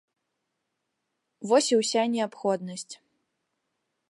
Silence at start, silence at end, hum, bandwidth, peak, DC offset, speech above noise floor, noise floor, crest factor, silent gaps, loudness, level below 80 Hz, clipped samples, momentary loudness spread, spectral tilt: 1.4 s; 1.15 s; none; 11.5 kHz; -10 dBFS; under 0.1%; 55 dB; -81 dBFS; 20 dB; none; -25 LUFS; -84 dBFS; under 0.1%; 19 LU; -3.5 dB/octave